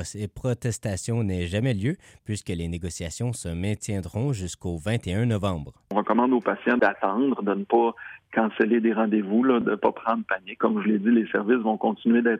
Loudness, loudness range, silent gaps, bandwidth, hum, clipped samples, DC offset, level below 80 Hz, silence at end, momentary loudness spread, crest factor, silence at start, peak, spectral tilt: -25 LUFS; 6 LU; none; 13 kHz; none; under 0.1%; under 0.1%; -50 dBFS; 0 s; 9 LU; 16 dB; 0 s; -8 dBFS; -6.5 dB/octave